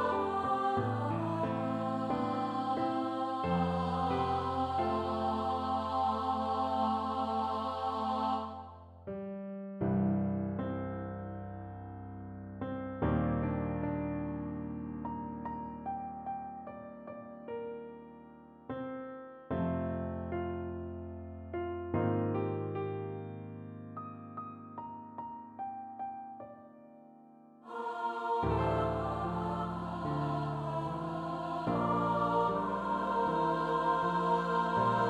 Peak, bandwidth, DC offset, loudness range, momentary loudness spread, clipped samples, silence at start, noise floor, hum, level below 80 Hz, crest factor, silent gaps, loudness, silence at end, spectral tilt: -18 dBFS; 11 kHz; under 0.1%; 11 LU; 15 LU; under 0.1%; 0 s; -57 dBFS; none; -54 dBFS; 16 dB; none; -35 LUFS; 0 s; -8 dB/octave